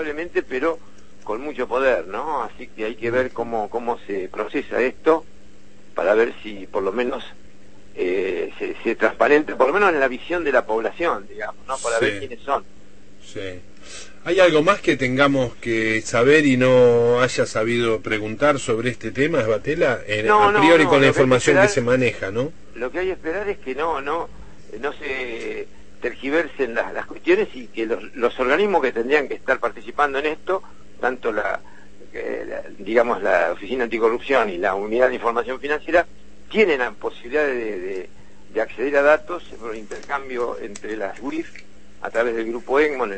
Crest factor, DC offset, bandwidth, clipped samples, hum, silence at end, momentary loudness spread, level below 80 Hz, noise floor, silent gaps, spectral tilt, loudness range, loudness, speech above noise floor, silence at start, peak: 18 dB; 2%; 8.8 kHz; under 0.1%; none; 0 s; 16 LU; -50 dBFS; -50 dBFS; none; -5 dB/octave; 9 LU; -21 LUFS; 29 dB; 0 s; -2 dBFS